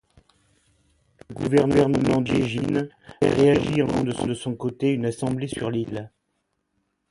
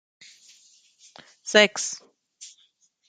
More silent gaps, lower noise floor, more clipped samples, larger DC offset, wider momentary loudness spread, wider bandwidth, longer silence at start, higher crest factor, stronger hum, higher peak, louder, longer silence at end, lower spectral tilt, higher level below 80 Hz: neither; first, -74 dBFS vs -64 dBFS; neither; neither; second, 11 LU vs 27 LU; first, 11.5 kHz vs 9.6 kHz; second, 1.3 s vs 1.45 s; second, 20 dB vs 26 dB; neither; about the same, -4 dBFS vs -2 dBFS; about the same, -23 LUFS vs -21 LUFS; first, 1.05 s vs 0.65 s; first, -7 dB/octave vs -1.5 dB/octave; first, -50 dBFS vs -78 dBFS